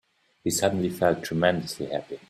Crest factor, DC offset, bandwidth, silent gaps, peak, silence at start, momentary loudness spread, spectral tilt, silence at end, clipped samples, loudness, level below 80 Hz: 22 dB; under 0.1%; 15.5 kHz; none; -6 dBFS; 0.45 s; 8 LU; -4.5 dB/octave; 0.1 s; under 0.1%; -26 LUFS; -60 dBFS